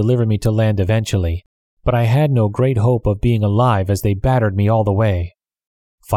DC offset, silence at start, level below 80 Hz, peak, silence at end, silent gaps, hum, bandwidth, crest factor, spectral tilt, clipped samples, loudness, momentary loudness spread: under 0.1%; 0 s; -34 dBFS; -2 dBFS; 0 s; 1.46-1.77 s, 5.67-5.98 s; none; 14.5 kHz; 14 dB; -7.5 dB/octave; under 0.1%; -17 LUFS; 5 LU